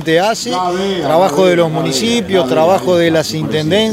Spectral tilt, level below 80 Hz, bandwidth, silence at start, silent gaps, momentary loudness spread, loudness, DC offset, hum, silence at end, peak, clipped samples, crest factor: -4.5 dB/octave; -48 dBFS; 16 kHz; 0 s; none; 5 LU; -13 LUFS; under 0.1%; none; 0 s; 0 dBFS; under 0.1%; 12 dB